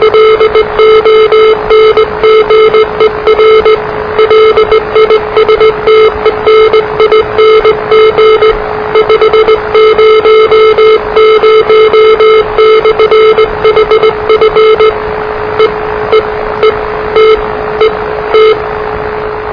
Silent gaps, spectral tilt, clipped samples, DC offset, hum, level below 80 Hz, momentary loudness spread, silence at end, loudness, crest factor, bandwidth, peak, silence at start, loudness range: none; -5.5 dB/octave; 2%; 0.3%; none; -30 dBFS; 6 LU; 0 s; -6 LUFS; 6 dB; 5.4 kHz; 0 dBFS; 0 s; 4 LU